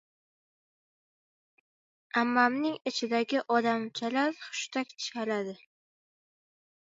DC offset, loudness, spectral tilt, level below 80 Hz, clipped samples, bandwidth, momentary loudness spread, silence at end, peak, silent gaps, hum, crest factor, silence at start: under 0.1%; -30 LUFS; -3.5 dB/octave; -84 dBFS; under 0.1%; 8 kHz; 9 LU; 1.3 s; -10 dBFS; none; none; 22 dB; 2.15 s